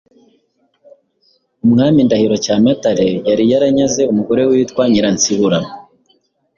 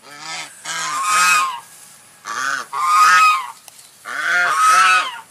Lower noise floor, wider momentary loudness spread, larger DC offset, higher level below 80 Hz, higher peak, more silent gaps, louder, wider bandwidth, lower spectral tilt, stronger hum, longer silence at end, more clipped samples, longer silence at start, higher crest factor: first, -60 dBFS vs -44 dBFS; second, 4 LU vs 18 LU; neither; first, -50 dBFS vs -74 dBFS; about the same, -2 dBFS vs -2 dBFS; neither; about the same, -13 LUFS vs -15 LUFS; second, 7.4 kHz vs 15.5 kHz; first, -5 dB/octave vs 1.5 dB/octave; neither; first, 0.75 s vs 0.1 s; neither; first, 1.65 s vs 0.05 s; about the same, 12 dB vs 16 dB